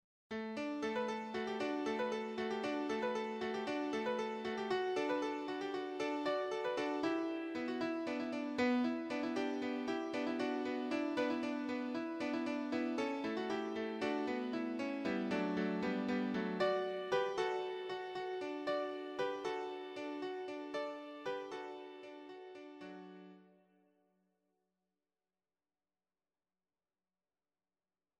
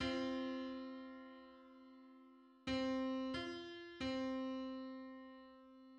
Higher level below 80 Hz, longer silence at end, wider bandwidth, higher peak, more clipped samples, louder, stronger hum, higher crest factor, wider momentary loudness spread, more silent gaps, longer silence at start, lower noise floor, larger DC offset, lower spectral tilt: second, -80 dBFS vs -68 dBFS; first, 4.75 s vs 0 s; first, 10.5 kHz vs 9 kHz; first, -22 dBFS vs -28 dBFS; neither; first, -39 LUFS vs -45 LUFS; neither; about the same, 18 dB vs 16 dB; second, 8 LU vs 21 LU; neither; first, 0.3 s vs 0 s; first, under -90 dBFS vs -65 dBFS; neither; about the same, -5.5 dB/octave vs -5 dB/octave